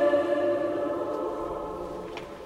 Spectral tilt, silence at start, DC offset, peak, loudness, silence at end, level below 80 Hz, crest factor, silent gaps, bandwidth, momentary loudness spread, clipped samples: -6.5 dB/octave; 0 s; under 0.1%; -12 dBFS; -29 LUFS; 0 s; -54 dBFS; 16 dB; none; 12 kHz; 12 LU; under 0.1%